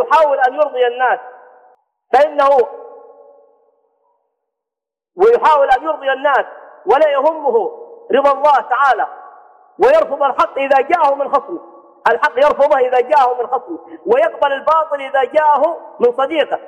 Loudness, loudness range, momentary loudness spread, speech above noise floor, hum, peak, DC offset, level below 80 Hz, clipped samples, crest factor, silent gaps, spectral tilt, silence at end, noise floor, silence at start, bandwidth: -14 LUFS; 4 LU; 8 LU; 71 dB; none; -2 dBFS; under 0.1%; -56 dBFS; under 0.1%; 14 dB; none; -4 dB/octave; 0 s; -85 dBFS; 0 s; 9.6 kHz